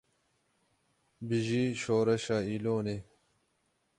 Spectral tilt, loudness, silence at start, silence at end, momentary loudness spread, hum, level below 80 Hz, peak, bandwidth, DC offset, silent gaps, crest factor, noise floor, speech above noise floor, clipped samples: -6 dB/octave; -31 LUFS; 1.2 s; 0.95 s; 10 LU; none; -64 dBFS; -16 dBFS; 11.5 kHz; under 0.1%; none; 16 dB; -76 dBFS; 45 dB; under 0.1%